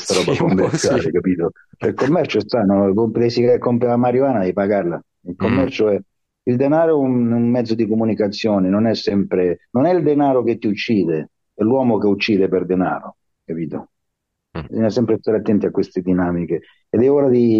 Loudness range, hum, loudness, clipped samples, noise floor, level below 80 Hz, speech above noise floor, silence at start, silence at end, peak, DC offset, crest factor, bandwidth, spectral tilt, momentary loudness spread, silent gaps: 4 LU; none; -18 LUFS; under 0.1%; -76 dBFS; -54 dBFS; 60 dB; 0 s; 0 s; -6 dBFS; under 0.1%; 12 dB; 11.5 kHz; -6.5 dB/octave; 10 LU; none